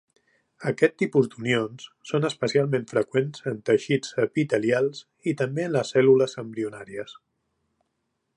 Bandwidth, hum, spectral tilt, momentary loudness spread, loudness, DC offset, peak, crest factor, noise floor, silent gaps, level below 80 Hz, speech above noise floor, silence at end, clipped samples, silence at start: 10.5 kHz; none; -6 dB/octave; 12 LU; -25 LUFS; under 0.1%; -4 dBFS; 20 dB; -77 dBFS; none; -70 dBFS; 53 dB; 1.25 s; under 0.1%; 0.6 s